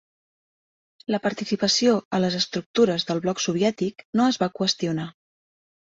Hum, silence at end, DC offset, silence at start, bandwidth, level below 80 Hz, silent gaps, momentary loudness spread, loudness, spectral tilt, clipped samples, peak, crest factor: none; 0.85 s; under 0.1%; 1.1 s; 8 kHz; -64 dBFS; 2.05-2.11 s, 2.66-2.74 s, 4.05-4.13 s; 8 LU; -23 LUFS; -4.5 dB/octave; under 0.1%; -6 dBFS; 18 dB